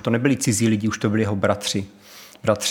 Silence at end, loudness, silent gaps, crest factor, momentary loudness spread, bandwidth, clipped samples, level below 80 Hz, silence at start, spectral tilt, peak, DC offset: 0 s; -21 LUFS; none; 18 dB; 8 LU; 18.5 kHz; under 0.1%; -60 dBFS; 0.05 s; -4.5 dB/octave; -4 dBFS; under 0.1%